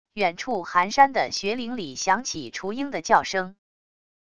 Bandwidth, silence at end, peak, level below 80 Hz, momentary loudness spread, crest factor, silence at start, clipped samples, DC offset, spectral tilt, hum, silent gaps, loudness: 10 kHz; 0.7 s; -4 dBFS; -60 dBFS; 12 LU; 22 dB; 0.05 s; under 0.1%; 0.4%; -3 dB/octave; none; none; -24 LUFS